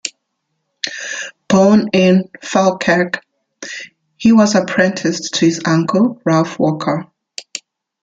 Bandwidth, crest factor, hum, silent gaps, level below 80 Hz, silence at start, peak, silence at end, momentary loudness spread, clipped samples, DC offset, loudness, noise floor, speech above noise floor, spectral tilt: 9.2 kHz; 16 dB; none; none; -56 dBFS; 0.05 s; 0 dBFS; 0.45 s; 17 LU; under 0.1%; under 0.1%; -15 LUFS; -72 dBFS; 58 dB; -5 dB/octave